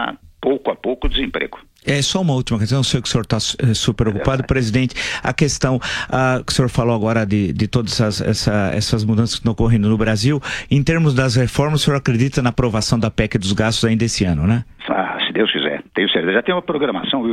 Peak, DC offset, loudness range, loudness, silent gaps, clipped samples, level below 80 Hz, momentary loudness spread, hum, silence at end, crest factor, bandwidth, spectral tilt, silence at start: -2 dBFS; under 0.1%; 2 LU; -18 LUFS; none; under 0.1%; -34 dBFS; 4 LU; none; 0 s; 16 dB; 13.5 kHz; -5 dB/octave; 0 s